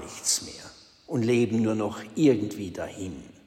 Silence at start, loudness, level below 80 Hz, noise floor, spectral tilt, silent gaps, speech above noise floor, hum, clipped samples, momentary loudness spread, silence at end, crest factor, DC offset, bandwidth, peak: 0 s; -26 LUFS; -60 dBFS; -49 dBFS; -4.5 dB/octave; none; 23 dB; none; under 0.1%; 16 LU; 0.15 s; 18 dB; under 0.1%; 16 kHz; -10 dBFS